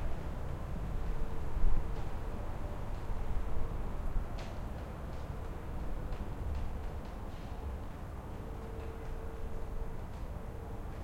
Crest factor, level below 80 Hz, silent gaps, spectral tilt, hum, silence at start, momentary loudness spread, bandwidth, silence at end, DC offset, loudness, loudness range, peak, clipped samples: 20 dB; -38 dBFS; none; -7.5 dB/octave; none; 0 s; 4 LU; 8.2 kHz; 0 s; under 0.1%; -43 LUFS; 3 LU; -16 dBFS; under 0.1%